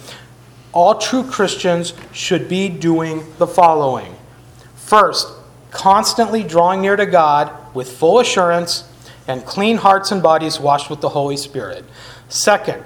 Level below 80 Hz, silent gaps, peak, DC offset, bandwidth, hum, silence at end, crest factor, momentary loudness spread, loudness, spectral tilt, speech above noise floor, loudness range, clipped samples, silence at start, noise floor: -52 dBFS; none; 0 dBFS; under 0.1%; 19.5 kHz; none; 0 s; 16 dB; 14 LU; -15 LUFS; -4 dB/octave; 27 dB; 3 LU; under 0.1%; 0 s; -42 dBFS